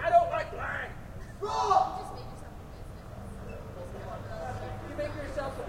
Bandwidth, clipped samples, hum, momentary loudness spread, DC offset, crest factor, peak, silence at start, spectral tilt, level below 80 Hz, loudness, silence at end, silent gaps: 16 kHz; under 0.1%; none; 19 LU; under 0.1%; 20 dB; -12 dBFS; 0 s; -5.5 dB/octave; -46 dBFS; -33 LUFS; 0 s; none